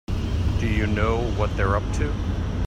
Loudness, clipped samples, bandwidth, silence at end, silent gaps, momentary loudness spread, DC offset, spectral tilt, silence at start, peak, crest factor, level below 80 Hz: -24 LUFS; under 0.1%; 9.8 kHz; 0 s; none; 5 LU; under 0.1%; -7 dB/octave; 0.1 s; -8 dBFS; 16 dB; -28 dBFS